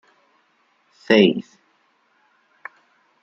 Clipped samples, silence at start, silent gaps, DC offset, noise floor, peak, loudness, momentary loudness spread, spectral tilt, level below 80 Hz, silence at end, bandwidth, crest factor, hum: under 0.1%; 1.1 s; none; under 0.1%; -63 dBFS; -2 dBFS; -17 LUFS; 26 LU; -6.5 dB/octave; -68 dBFS; 1.8 s; 7.4 kHz; 22 dB; none